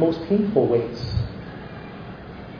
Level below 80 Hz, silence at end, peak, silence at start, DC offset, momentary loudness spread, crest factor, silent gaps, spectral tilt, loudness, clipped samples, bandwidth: -42 dBFS; 0 s; -6 dBFS; 0 s; under 0.1%; 18 LU; 18 dB; none; -9 dB/octave; -23 LUFS; under 0.1%; 5.4 kHz